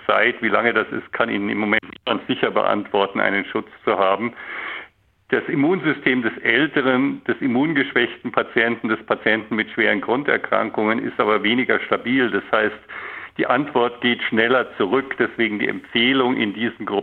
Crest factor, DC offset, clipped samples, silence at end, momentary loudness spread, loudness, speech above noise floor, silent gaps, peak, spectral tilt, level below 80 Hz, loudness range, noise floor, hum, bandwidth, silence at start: 18 dB; under 0.1%; under 0.1%; 0 s; 7 LU; -20 LUFS; 27 dB; none; -2 dBFS; -8 dB/octave; -66 dBFS; 2 LU; -47 dBFS; none; 4.5 kHz; 0 s